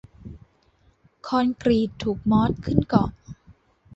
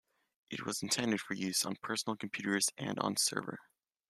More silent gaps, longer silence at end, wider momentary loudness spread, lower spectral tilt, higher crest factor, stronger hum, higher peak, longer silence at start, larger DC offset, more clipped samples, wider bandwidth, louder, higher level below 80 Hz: neither; about the same, 0.6 s vs 0.5 s; first, 22 LU vs 10 LU; first, -8 dB/octave vs -2.5 dB/octave; about the same, 22 dB vs 24 dB; neither; first, -4 dBFS vs -14 dBFS; second, 0.25 s vs 0.5 s; neither; neither; second, 7.8 kHz vs 14.5 kHz; first, -23 LUFS vs -35 LUFS; first, -44 dBFS vs -78 dBFS